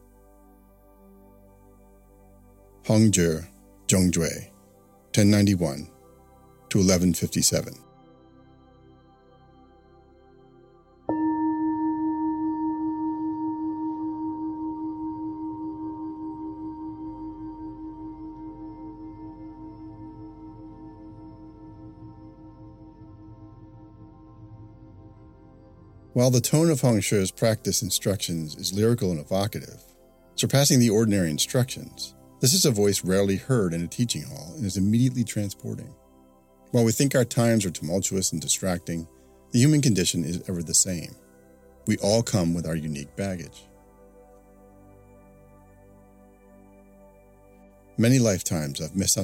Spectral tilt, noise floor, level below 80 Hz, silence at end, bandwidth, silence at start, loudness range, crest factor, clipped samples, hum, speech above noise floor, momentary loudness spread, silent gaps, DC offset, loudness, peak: -4.5 dB/octave; -56 dBFS; -54 dBFS; 0 s; 16.5 kHz; 2.85 s; 17 LU; 22 dB; under 0.1%; none; 33 dB; 22 LU; none; under 0.1%; -24 LUFS; -6 dBFS